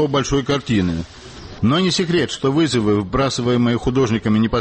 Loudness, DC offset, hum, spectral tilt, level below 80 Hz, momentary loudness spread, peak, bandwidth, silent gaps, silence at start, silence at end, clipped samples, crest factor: -18 LUFS; under 0.1%; none; -5.5 dB/octave; -38 dBFS; 6 LU; -8 dBFS; 8.8 kHz; none; 0 s; 0 s; under 0.1%; 10 dB